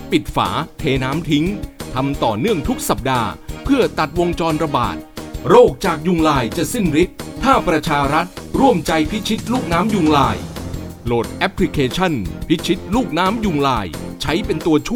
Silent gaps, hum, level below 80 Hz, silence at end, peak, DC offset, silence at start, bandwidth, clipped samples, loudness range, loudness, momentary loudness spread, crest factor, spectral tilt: none; none; -34 dBFS; 0 s; 0 dBFS; under 0.1%; 0 s; 19 kHz; under 0.1%; 3 LU; -18 LUFS; 9 LU; 18 dB; -5.5 dB/octave